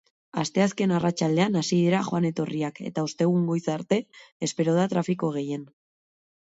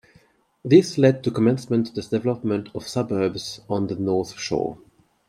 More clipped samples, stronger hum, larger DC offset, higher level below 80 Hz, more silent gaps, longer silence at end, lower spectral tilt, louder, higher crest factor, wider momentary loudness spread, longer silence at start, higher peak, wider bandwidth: neither; neither; neither; second, -68 dBFS vs -60 dBFS; first, 4.32-4.40 s vs none; first, 0.8 s vs 0.5 s; about the same, -6 dB/octave vs -6.5 dB/octave; second, -26 LUFS vs -22 LUFS; about the same, 16 dB vs 20 dB; second, 8 LU vs 11 LU; second, 0.35 s vs 0.65 s; second, -8 dBFS vs -2 dBFS; second, 8 kHz vs 14.5 kHz